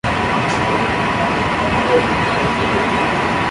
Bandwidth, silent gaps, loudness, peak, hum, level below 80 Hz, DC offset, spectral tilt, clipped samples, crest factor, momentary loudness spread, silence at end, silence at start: 11.5 kHz; none; -16 LUFS; -2 dBFS; none; -34 dBFS; under 0.1%; -5.5 dB/octave; under 0.1%; 14 dB; 2 LU; 0 s; 0.05 s